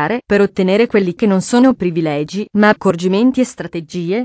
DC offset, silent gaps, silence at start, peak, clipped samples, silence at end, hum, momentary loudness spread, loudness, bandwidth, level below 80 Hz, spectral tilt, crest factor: under 0.1%; none; 0 s; 0 dBFS; under 0.1%; 0 s; none; 8 LU; -14 LUFS; 8 kHz; -50 dBFS; -6 dB/octave; 14 dB